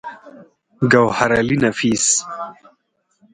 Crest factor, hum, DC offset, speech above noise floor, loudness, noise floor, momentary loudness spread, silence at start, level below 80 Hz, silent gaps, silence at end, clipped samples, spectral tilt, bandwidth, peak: 18 dB; none; under 0.1%; 48 dB; -16 LUFS; -65 dBFS; 17 LU; 0.05 s; -50 dBFS; none; 0.8 s; under 0.1%; -3.5 dB/octave; 10.5 kHz; 0 dBFS